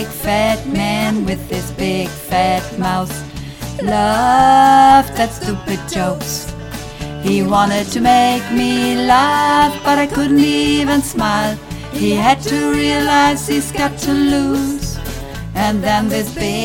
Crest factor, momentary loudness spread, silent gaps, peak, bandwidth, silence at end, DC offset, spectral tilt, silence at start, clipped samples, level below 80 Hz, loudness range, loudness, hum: 14 dB; 13 LU; none; 0 dBFS; 18.5 kHz; 0 s; under 0.1%; -4.5 dB/octave; 0 s; under 0.1%; -34 dBFS; 5 LU; -15 LUFS; none